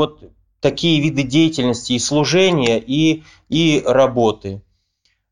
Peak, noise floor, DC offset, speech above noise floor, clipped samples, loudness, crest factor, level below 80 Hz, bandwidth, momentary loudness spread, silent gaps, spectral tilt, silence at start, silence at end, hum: -2 dBFS; -66 dBFS; 0.3%; 50 dB; under 0.1%; -16 LUFS; 16 dB; -50 dBFS; 11 kHz; 8 LU; none; -5 dB/octave; 0 s; 0.7 s; none